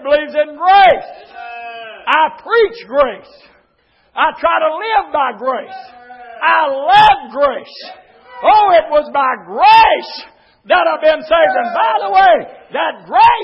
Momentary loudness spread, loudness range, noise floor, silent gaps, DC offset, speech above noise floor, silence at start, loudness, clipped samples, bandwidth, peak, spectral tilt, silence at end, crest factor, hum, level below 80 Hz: 20 LU; 5 LU; -57 dBFS; none; under 0.1%; 44 dB; 0 s; -12 LUFS; under 0.1%; 7.4 kHz; 0 dBFS; -4.5 dB/octave; 0 s; 14 dB; none; -48 dBFS